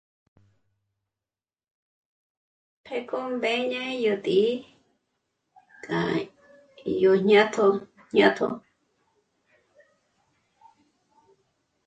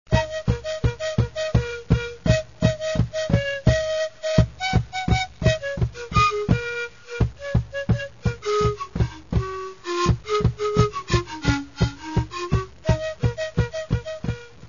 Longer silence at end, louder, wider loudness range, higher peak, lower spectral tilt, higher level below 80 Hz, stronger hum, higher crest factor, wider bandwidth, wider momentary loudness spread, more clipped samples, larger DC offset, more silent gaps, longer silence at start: first, 3.3 s vs 0 s; about the same, -24 LUFS vs -24 LUFS; first, 10 LU vs 3 LU; second, -6 dBFS vs 0 dBFS; about the same, -5.5 dB/octave vs -6 dB/octave; second, -70 dBFS vs -32 dBFS; neither; about the same, 22 dB vs 22 dB; first, 8.8 kHz vs 7.4 kHz; first, 16 LU vs 6 LU; neither; second, under 0.1% vs 0.4%; neither; first, 2.9 s vs 0.1 s